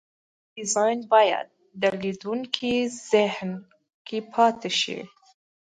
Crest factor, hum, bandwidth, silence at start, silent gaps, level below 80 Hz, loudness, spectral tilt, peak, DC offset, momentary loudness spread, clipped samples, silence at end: 22 dB; none; 9.6 kHz; 0.55 s; 3.94-4.05 s; -68 dBFS; -24 LUFS; -3 dB/octave; -4 dBFS; under 0.1%; 14 LU; under 0.1%; 0.6 s